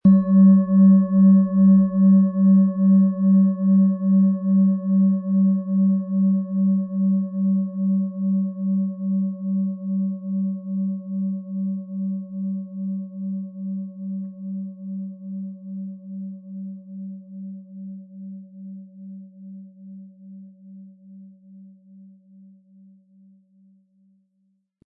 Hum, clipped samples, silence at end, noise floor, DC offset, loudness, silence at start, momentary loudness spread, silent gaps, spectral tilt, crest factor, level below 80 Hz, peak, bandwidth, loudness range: none; under 0.1%; 3.2 s; -69 dBFS; under 0.1%; -20 LUFS; 0.05 s; 23 LU; none; -16 dB/octave; 14 dB; -62 dBFS; -6 dBFS; 1.8 kHz; 22 LU